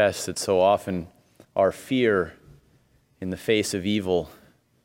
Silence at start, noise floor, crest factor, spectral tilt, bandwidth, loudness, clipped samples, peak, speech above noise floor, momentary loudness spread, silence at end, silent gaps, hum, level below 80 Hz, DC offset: 0 s; -62 dBFS; 18 dB; -4.5 dB/octave; 17 kHz; -24 LUFS; under 0.1%; -6 dBFS; 39 dB; 13 LU; 0.5 s; none; none; -58 dBFS; under 0.1%